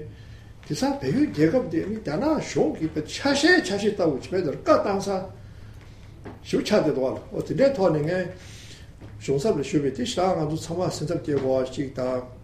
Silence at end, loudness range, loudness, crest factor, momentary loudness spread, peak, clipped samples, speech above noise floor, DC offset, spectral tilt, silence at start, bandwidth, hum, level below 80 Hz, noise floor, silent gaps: 0 s; 3 LU; -24 LUFS; 20 dB; 21 LU; -6 dBFS; under 0.1%; 20 dB; under 0.1%; -5.5 dB/octave; 0 s; 14 kHz; none; -48 dBFS; -44 dBFS; none